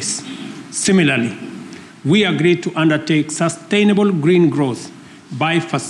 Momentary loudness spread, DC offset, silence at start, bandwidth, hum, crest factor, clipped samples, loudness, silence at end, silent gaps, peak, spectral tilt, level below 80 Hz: 17 LU; under 0.1%; 0 s; 12 kHz; none; 12 dB; under 0.1%; -16 LUFS; 0 s; none; -4 dBFS; -5 dB/octave; -58 dBFS